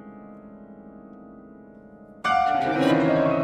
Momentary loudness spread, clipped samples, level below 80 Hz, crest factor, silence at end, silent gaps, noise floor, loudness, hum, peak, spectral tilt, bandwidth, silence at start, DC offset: 25 LU; under 0.1%; -58 dBFS; 18 dB; 0 s; none; -47 dBFS; -22 LUFS; none; -8 dBFS; -6.5 dB/octave; 12 kHz; 0.05 s; under 0.1%